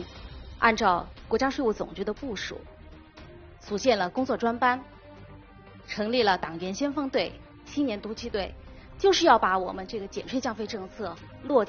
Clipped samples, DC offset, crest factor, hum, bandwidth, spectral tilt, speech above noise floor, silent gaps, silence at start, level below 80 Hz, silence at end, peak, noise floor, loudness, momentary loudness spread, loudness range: under 0.1%; under 0.1%; 22 dB; none; 7 kHz; -2.5 dB/octave; 22 dB; none; 0 s; -50 dBFS; 0 s; -6 dBFS; -49 dBFS; -27 LUFS; 20 LU; 3 LU